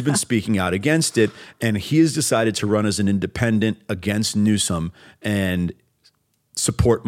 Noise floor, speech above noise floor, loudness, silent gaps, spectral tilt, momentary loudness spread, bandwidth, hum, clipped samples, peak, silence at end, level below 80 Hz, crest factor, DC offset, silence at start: -61 dBFS; 41 dB; -21 LUFS; none; -5 dB/octave; 8 LU; 16.5 kHz; none; under 0.1%; -2 dBFS; 0 s; -42 dBFS; 18 dB; under 0.1%; 0 s